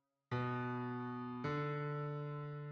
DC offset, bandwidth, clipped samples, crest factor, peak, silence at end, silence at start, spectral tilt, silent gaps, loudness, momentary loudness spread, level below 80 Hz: under 0.1%; 6.4 kHz; under 0.1%; 14 dB; -28 dBFS; 0 s; 0.3 s; -8.5 dB/octave; none; -42 LUFS; 5 LU; -74 dBFS